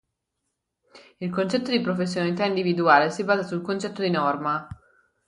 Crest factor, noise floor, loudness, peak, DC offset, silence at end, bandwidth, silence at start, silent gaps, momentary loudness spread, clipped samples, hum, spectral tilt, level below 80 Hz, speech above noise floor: 22 dB; -80 dBFS; -24 LUFS; -2 dBFS; under 0.1%; 0.55 s; 11.5 kHz; 0.95 s; none; 11 LU; under 0.1%; none; -6 dB/octave; -62 dBFS; 56 dB